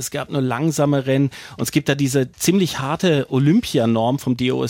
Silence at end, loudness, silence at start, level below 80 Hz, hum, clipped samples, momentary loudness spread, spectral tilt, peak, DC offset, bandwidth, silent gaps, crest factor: 0 s; -19 LUFS; 0 s; -52 dBFS; none; under 0.1%; 5 LU; -5.5 dB/octave; -4 dBFS; under 0.1%; 17 kHz; none; 14 dB